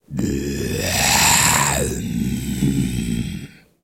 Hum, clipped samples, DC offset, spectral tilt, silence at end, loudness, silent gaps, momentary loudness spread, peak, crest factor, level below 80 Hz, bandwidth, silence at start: none; under 0.1%; under 0.1%; -3 dB/octave; 0.35 s; -18 LUFS; none; 12 LU; -2 dBFS; 18 dB; -34 dBFS; 16.5 kHz; 0.1 s